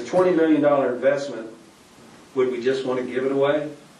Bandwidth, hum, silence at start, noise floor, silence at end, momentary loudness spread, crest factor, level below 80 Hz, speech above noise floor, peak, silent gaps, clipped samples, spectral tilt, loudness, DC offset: 11 kHz; none; 0 s; -49 dBFS; 0.2 s; 12 LU; 16 dB; -70 dBFS; 28 dB; -6 dBFS; none; under 0.1%; -6 dB/octave; -22 LUFS; under 0.1%